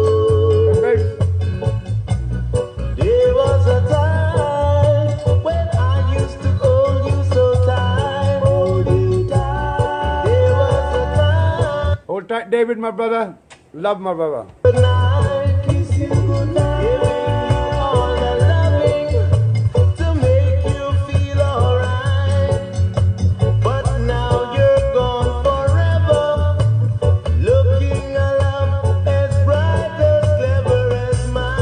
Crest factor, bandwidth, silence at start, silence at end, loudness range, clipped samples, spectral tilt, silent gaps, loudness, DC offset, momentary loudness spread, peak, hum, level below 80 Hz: 14 dB; 9.8 kHz; 0 s; 0 s; 2 LU; under 0.1%; -7.5 dB/octave; none; -17 LUFS; under 0.1%; 6 LU; -2 dBFS; none; -28 dBFS